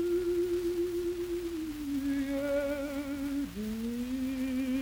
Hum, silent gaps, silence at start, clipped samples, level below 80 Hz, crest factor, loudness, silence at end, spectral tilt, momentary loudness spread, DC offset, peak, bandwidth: none; none; 0 s; under 0.1%; -52 dBFS; 10 dB; -33 LUFS; 0 s; -5.5 dB/octave; 5 LU; under 0.1%; -22 dBFS; 19.5 kHz